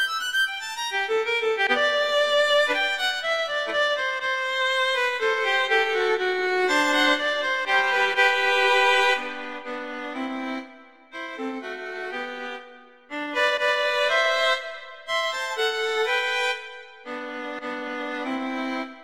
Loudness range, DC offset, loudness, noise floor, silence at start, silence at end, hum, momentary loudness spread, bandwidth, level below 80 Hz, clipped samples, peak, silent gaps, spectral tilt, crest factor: 9 LU; 0.2%; -23 LUFS; -48 dBFS; 0 s; 0 s; none; 14 LU; 16 kHz; -68 dBFS; under 0.1%; -8 dBFS; none; -0.5 dB/octave; 16 dB